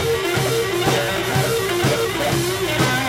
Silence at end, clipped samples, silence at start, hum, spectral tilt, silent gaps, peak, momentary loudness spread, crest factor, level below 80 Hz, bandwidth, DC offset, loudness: 0 s; under 0.1%; 0 s; none; -4 dB/octave; none; -6 dBFS; 1 LU; 14 dB; -42 dBFS; 16.5 kHz; under 0.1%; -19 LUFS